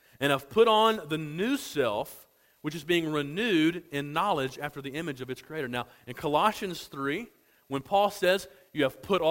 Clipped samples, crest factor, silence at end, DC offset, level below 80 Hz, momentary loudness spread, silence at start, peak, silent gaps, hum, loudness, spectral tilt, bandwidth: under 0.1%; 20 dB; 0 s; under 0.1%; -64 dBFS; 13 LU; 0.2 s; -10 dBFS; none; none; -29 LUFS; -5 dB/octave; 16.5 kHz